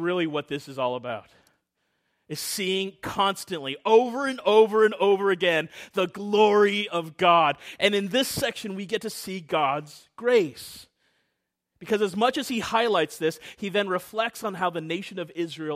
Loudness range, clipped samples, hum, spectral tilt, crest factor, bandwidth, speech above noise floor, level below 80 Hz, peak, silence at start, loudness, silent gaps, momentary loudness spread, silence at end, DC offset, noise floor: 7 LU; under 0.1%; none; -4 dB/octave; 20 dB; 15.5 kHz; 55 dB; -66 dBFS; -6 dBFS; 0 s; -25 LUFS; none; 13 LU; 0 s; under 0.1%; -80 dBFS